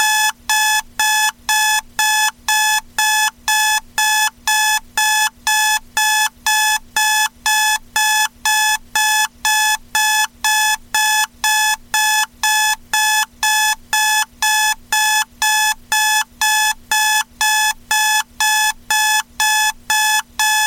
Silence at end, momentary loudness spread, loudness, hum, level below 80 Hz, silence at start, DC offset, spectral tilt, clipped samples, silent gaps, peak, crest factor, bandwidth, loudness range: 0 s; 2 LU; -15 LUFS; none; -48 dBFS; 0 s; under 0.1%; 3.5 dB/octave; under 0.1%; none; -4 dBFS; 12 dB; 17 kHz; 0 LU